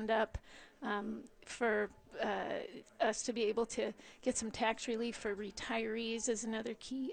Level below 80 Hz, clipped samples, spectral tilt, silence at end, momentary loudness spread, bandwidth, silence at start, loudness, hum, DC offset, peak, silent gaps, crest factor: -62 dBFS; under 0.1%; -3 dB/octave; 0 s; 9 LU; 9.6 kHz; 0 s; -38 LUFS; none; under 0.1%; -20 dBFS; none; 18 dB